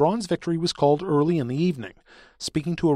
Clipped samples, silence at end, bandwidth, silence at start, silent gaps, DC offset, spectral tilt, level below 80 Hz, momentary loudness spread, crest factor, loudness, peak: under 0.1%; 0 s; 12.5 kHz; 0 s; none; under 0.1%; -6.5 dB/octave; -54 dBFS; 11 LU; 16 dB; -24 LUFS; -6 dBFS